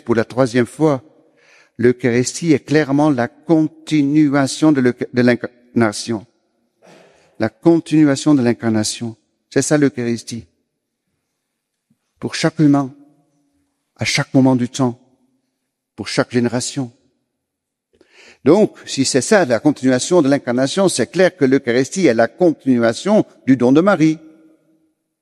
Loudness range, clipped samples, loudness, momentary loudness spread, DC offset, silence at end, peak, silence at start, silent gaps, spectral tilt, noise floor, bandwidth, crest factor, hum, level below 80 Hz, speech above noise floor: 7 LU; under 0.1%; -16 LUFS; 10 LU; under 0.1%; 1.05 s; 0 dBFS; 0.05 s; none; -5.5 dB/octave; -78 dBFS; 12.5 kHz; 16 dB; none; -58 dBFS; 63 dB